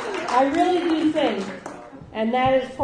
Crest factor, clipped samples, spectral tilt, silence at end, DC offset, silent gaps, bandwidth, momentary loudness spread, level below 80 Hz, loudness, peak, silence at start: 16 dB; under 0.1%; -5 dB/octave; 0 s; under 0.1%; none; 10.5 kHz; 16 LU; -52 dBFS; -21 LUFS; -6 dBFS; 0 s